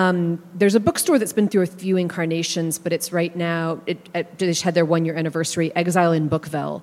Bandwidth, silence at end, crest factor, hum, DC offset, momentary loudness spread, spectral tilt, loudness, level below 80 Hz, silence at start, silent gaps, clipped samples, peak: 16 kHz; 0 s; 18 dB; none; under 0.1%; 7 LU; -5 dB/octave; -21 LUFS; -60 dBFS; 0 s; none; under 0.1%; -2 dBFS